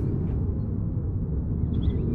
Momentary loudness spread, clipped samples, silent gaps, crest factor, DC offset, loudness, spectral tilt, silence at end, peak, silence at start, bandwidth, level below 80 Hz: 3 LU; under 0.1%; none; 12 dB; under 0.1%; -28 LUFS; -12 dB/octave; 0 s; -14 dBFS; 0 s; 4 kHz; -32 dBFS